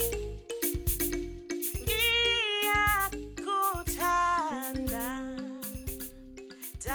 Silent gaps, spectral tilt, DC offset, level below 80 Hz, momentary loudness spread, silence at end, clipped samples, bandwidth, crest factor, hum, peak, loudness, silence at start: none; -2.5 dB/octave; under 0.1%; -42 dBFS; 14 LU; 0 s; under 0.1%; over 20 kHz; 16 dB; none; -14 dBFS; -30 LUFS; 0 s